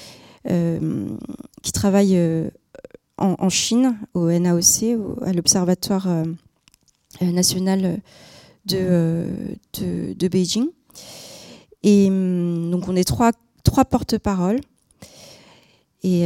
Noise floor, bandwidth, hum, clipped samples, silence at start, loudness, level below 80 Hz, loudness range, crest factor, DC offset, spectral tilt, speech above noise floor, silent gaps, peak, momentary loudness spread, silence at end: -59 dBFS; 17 kHz; none; under 0.1%; 0 s; -20 LUFS; -46 dBFS; 4 LU; 20 dB; under 0.1%; -5 dB/octave; 39 dB; none; 0 dBFS; 14 LU; 0 s